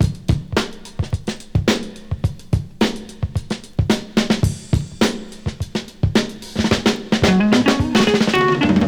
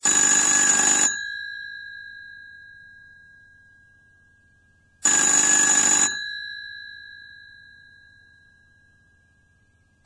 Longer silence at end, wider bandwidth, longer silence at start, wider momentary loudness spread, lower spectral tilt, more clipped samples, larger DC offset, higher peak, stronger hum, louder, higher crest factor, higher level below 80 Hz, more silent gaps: second, 0 s vs 2.85 s; first, over 20 kHz vs 10.5 kHz; about the same, 0 s vs 0 s; second, 12 LU vs 24 LU; first, -5.5 dB/octave vs 1 dB/octave; neither; first, 0.1% vs under 0.1%; first, 0 dBFS vs -6 dBFS; neither; about the same, -19 LUFS vs -17 LUFS; about the same, 18 dB vs 18 dB; first, -32 dBFS vs -64 dBFS; neither